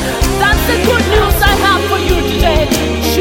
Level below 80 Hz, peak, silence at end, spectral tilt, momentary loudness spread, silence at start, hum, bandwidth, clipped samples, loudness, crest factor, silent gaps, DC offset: -18 dBFS; 0 dBFS; 0 s; -4.5 dB/octave; 4 LU; 0 s; none; 17 kHz; under 0.1%; -12 LUFS; 12 dB; none; under 0.1%